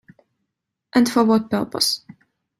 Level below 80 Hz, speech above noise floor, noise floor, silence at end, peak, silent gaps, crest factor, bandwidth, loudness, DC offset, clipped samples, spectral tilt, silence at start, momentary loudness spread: -62 dBFS; 61 dB; -79 dBFS; 0.6 s; -4 dBFS; none; 18 dB; 16 kHz; -19 LUFS; under 0.1%; under 0.1%; -4 dB/octave; 0.95 s; 7 LU